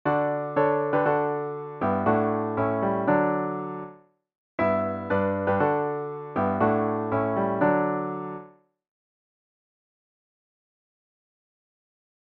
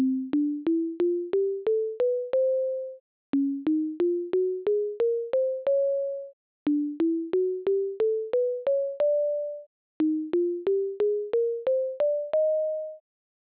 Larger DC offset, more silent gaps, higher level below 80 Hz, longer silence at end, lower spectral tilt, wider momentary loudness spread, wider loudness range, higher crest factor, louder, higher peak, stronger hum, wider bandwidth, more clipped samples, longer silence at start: neither; second, 4.37-4.58 s vs 3.00-3.33 s, 6.33-6.66 s, 9.66-10.00 s; first, -64 dBFS vs -74 dBFS; first, 3.8 s vs 0.6 s; about the same, -10.5 dB/octave vs -10 dB/octave; first, 10 LU vs 6 LU; first, 5 LU vs 1 LU; first, 18 dB vs 8 dB; about the same, -25 LUFS vs -27 LUFS; first, -8 dBFS vs -18 dBFS; neither; first, 5.2 kHz vs 4 kHz; neither; about the same, 0.05 s vs 0 s